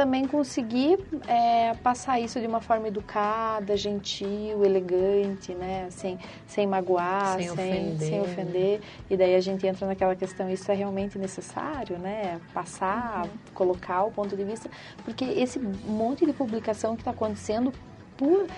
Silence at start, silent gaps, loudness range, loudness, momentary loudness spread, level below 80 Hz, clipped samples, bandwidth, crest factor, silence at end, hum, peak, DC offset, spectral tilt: 0 s; none; 4 LU; -28 LUFS; 10 LU; -56 dBFS; under 0.1%; 11 kHz; 18 dB; 0 s; none; -10 dBFS; under 0.1%; -6 dB/octave